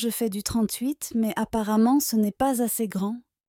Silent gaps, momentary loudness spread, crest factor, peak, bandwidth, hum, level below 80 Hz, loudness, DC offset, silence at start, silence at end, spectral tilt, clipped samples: none; 7 LU; 14 dB; -10 dBFS; 17.5 kHz; none; -54 dBFS; -25 LUFS; under 0.1%; 0 s; 0.3 s; -4.5 dB/octave; under 0.1%